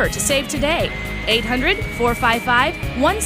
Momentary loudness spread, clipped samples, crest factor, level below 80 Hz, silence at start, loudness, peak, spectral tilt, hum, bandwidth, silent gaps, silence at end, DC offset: 4 LU; under 0.1%; 16 dB; -32 dBFS; 0 s; -18 LUFS; -4 dBFS; -3.5 dB/octave; none; 16 kHz; none; 0 s; under 0.1%